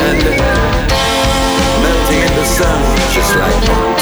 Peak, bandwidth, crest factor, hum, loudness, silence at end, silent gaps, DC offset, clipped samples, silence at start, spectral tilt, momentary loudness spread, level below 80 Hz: -2 dBFS; over 20 kHz; 10 dB; none; -12 LUFS; 0 s; none; under 0.1%; under 0.1%; 0 s; -4 dB/octave; 1 LU; -18 dBFS